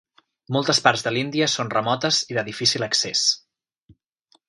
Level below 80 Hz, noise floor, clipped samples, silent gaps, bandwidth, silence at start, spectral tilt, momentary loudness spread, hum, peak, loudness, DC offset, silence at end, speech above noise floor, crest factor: -66 dBFS; -64 dBFS; under 0.1%; none; 11.5 kHz; 0.5 s; -2.5 dB/octave; 6 LU; none; 0 dBFS; -21 LUFS; under 0.1%; 1.1 s; 42 dB; 24 dB